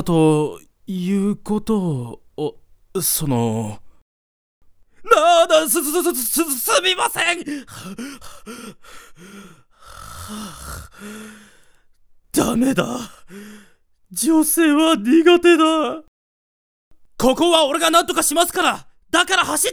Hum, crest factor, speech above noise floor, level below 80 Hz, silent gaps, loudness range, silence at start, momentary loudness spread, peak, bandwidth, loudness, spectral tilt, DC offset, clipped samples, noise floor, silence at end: none; 20 dB; 33 dB; -48 dBFS; 4.02-4.61 s, 16.08-16.91 s; 19 LU; 0 s; 22 LU; 0 dBFS; over 20 kHz; -17 LUFS; -3.5 dB/octave; under 0.1%; under 0.1%; -52 dBFS; 0 s